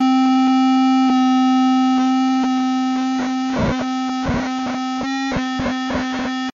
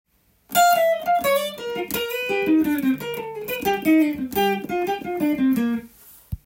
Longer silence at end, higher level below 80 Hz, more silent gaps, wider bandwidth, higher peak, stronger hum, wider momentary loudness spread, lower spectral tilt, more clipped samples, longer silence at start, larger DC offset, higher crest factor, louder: about the same, 0.05 s vs 0.1 s; first, -42 dBFS vs -52 dBFS; neither; second, 7.4 kHz vs 17 kHz; second, -10 dBFS vs -6 dBFS; neither; second, 7 LU vs 10 LU; about the same, -4 dB/octave vs -4 dB/octave; neither; second, 0 s vs 0.5 s; neither; second, 8 dB vs 16 dB; first, -18 LUFS vs -22 LUFS